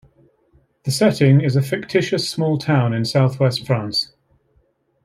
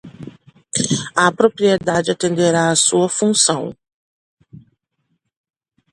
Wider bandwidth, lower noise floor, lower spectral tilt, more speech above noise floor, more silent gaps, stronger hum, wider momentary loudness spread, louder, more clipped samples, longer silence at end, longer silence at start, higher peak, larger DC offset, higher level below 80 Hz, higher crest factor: first, 15 kHz vs 11.5 kHz; second, -62 dBFS vs -70 dBFS; first, -6 dB/octave vs -3.5 dB/octave; second, 45 dB vs 54 dB; second, none vs 3.93-4.37 s; neither; about the same, 8 LU vs 10 LU; about the same, -18 LUFS vs -16 LUFS; neither; second, 1 s vs 1.35 s; first, 0.85 s vs 0.05 s; about the same, -2 dBFS vs 0 dBFS; neither; about the same, -58 dBFS vs -58 dBFS; about the same, 16 dB vs 18 dB